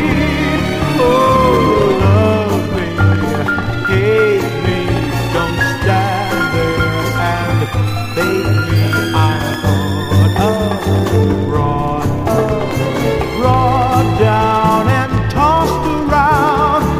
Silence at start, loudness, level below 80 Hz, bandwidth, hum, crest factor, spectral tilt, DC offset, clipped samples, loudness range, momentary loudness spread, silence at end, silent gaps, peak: 0 s; -14 LUFS; -28 dBFS; 15.5 kHz; none; 12 dB; -6.5 dB/octave; under 0.1%; under 0.1%; 2 LU; 5 LU; 0 s; none; 0 dBFS